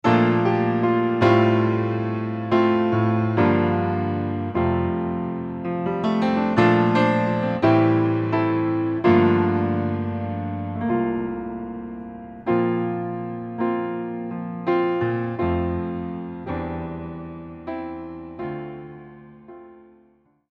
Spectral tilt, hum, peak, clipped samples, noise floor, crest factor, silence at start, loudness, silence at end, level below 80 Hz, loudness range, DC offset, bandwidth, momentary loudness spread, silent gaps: -9 dB/octave; none; -4 dBFS; under 0.1%; -59 dBFS; 18 dB; 0.05 s; -22 LUFS; 0.8 s; -50 dBFS; 11 LU; under 0.1%; 7 kHz; 15 LU; none